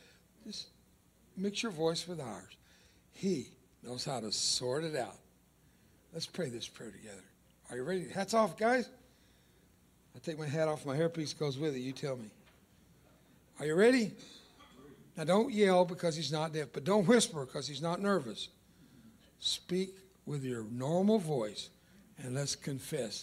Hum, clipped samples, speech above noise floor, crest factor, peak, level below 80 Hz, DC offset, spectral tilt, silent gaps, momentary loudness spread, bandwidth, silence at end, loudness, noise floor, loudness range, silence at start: none; under 0.1%; 33 dB; 22 dB; -14 dBFS; -72 dBFS; under 0.1%; -4.5 dB/octave; none; 21 LU; 16 kHz; 0 s; -34 LUFS; -66 dBFS; 8 LU; 0.45 s